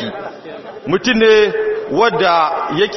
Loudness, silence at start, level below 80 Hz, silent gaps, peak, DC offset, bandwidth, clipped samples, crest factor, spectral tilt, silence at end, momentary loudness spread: -14 LUFS; 0 s; -48 dBFS; none; 0 dBFS; under 0.1%; 6.2 kHz; under 0.1%; 14 dB; -2 dB/octave; 0 s; 19 LU